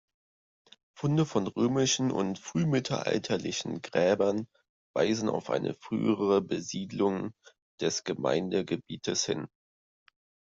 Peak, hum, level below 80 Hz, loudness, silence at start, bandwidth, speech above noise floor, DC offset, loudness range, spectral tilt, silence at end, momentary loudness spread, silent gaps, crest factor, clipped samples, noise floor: -12 dBFS; none; -68 dBFS; -30 LUFS; 0.95 s; 7.8 kHz; over 61 dB; under 0.1%; 3 LU; -5 dB/octave; 1 s; 9 LU; 4.69-4.94 s, 7.62-7.78 s; 18 dB; under 0.1%; under -90 dBFS